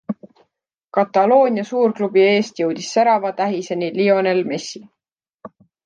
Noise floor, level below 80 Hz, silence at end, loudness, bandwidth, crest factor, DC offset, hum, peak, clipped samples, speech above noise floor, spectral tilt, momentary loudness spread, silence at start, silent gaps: -73 dBFS; -72 dBFS; 0.4 s; -18 LUFS; 9.2 kHz; 16 dB; under 0.1%; none; -2 dBFS; under 0.1%; 56 dB; -5 dB/octave; 12 LU; 0.1 s; 0.84-0.88 s, 5.34-5.39 s